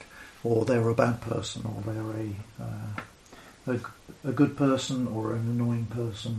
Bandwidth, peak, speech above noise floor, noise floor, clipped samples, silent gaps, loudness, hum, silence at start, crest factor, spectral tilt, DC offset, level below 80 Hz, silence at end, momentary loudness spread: 13 kHz; -6 dBFS; 23 dB; -51 dBFS; under 0.1%; none; -29 LUFS; none; 0 s; 22 dB; -6.5 dB/octave; under 0.1%; -58 dBFS; 0 s; 14 LU